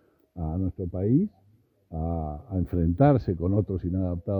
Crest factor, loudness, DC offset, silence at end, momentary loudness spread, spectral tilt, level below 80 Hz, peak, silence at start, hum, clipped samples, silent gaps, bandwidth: 18 dB; -27 LUFS; under 0.1%; 0 s; 12 LU; -12.5 dB/octave; -42 dBFS; -8 dBFS; 0.35 s; none; under 0.1%; none; 4.9 kHz